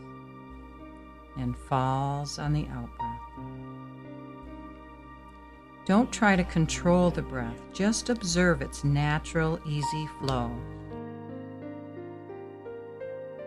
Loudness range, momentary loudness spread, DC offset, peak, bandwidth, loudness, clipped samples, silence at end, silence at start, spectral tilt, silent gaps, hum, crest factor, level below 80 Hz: 11 LU; 22 LU; under 0.1%; -8 dBFS; 12.5 kHz; -29 LUFS; under 0.1%; 0 s; 0 s; -5.5 dB/octave; none; none; 22 dB; -46 dBFS